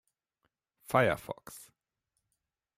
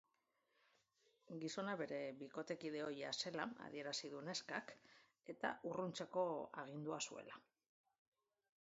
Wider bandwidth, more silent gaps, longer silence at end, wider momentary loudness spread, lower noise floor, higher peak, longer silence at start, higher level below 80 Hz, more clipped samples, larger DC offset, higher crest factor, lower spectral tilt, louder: first, 16 kHz vs 7.6 kHz; neither; about the same, 1.2 s vs 1.25 s; first, 22 LU vs 12 LU; about the same, -85 dBFS vs -85 dBFS; first, -12 dBFS vs -28 dBFS; second, 0.9 s vs 1.3 s; first, -66 dBFS vs under -90 dBFS; neither; neither; about the same, 24 dB vs 22 dB; first, -5.5 dB/octave vs -3 dB/octave; first, -30 LUFS vs -47 LUFS